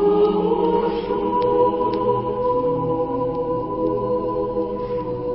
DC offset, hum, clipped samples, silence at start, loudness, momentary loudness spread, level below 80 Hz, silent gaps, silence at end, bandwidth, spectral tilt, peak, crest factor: under 0.1%; 50 Hz at -45 dBFS; under 0.1%; 0 s; -21 LUFS; 6 LU; -44 dBFS; none; 0 s; 5.6 kHz; -12 dB/octave; -6 dBFS; 14 dB